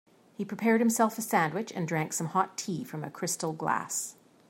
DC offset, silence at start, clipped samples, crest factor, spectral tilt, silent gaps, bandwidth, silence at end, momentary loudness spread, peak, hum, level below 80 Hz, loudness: under 0.1%; 0.4 s; under 0.1%; 20 dB; -4.5 dB/octave; none; 16.5 kHz; 0.4 s; 11 LU; -10 dBFS; none; -78 dBFS; -30 LUFS